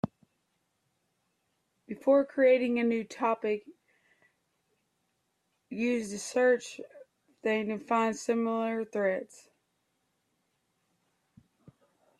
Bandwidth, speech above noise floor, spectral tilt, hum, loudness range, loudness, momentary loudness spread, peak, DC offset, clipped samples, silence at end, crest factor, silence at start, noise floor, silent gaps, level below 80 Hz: 12.5 kHz; 49 dB; -5 dB/octave; none; 7 LU; -29 LUFS; 16 LU; -14 dBFS; under 0.1%; under 0.1%; 2.95 s; 18 dB; 0.05 s; -78 dBFS; none; -76 dBFS